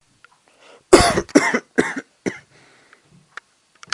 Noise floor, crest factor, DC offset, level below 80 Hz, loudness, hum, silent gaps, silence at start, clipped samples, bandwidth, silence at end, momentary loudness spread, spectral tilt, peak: -55 dBFS; 22 dB; under 0.1%; -42 dBFS; -18 LUFS; none; none; 0.9 s; under 0.1%; 11.5 kHz; 1.55 s; 26 LU; -4 dB/octave; 0 dBFS